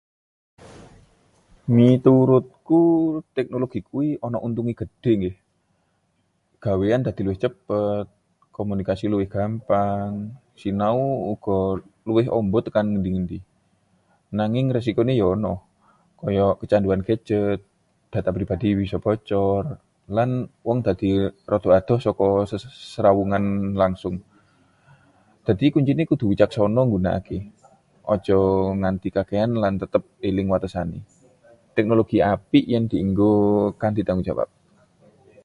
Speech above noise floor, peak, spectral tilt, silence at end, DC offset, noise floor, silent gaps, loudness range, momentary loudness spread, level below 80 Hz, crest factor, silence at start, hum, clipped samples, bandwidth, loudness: 48 dB; -2 dBFS; -9 dB/octave; 1 s; under 0.1%; -68 dBFS; none; 5 LU; 12 LU; -46 dBFS; 20 dB; 0.6 s; none; under 0.1%; 10.5 kHz; -22 LUFS